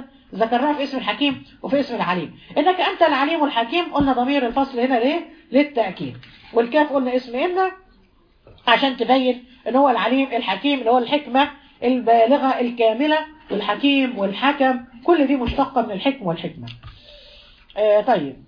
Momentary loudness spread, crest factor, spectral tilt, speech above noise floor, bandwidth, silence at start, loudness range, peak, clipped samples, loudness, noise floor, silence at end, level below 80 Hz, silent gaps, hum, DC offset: 9 LU; 20 dB; -7 dB/octave; 36 dB; 5.2 kHz; 0 s; 3 LU; 0 dBFS; under 0.1%; -20 LUFS; -55 dBFS; 0.1 s; -48 dBFS; none; none; under 0.1%